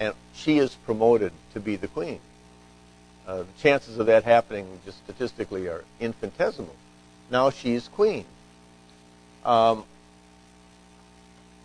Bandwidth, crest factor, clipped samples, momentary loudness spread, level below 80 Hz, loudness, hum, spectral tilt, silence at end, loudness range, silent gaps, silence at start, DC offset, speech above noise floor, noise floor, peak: 10.5 kHz; 22 dB; under 0.1%; 15 LU; -58 dBFS; -25 LUFS; 60 Hz at -55 dBFS; -6 dB/octave; 1.8 s; 4 LU; none; 0 s; under 0.1%; 29 dB; -53 dBFS; -6 dBFS